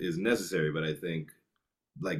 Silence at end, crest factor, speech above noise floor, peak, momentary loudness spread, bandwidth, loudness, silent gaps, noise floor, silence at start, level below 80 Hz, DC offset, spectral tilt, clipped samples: 0 s; 20 dB; 52 dB; -14 dBFS; 10 LU; 15 kHz; -32 LUFS; none; -84 dBFS; 0 s; -66 dBFS; under 0.1%; -5.5 dB/octave; under 0.1%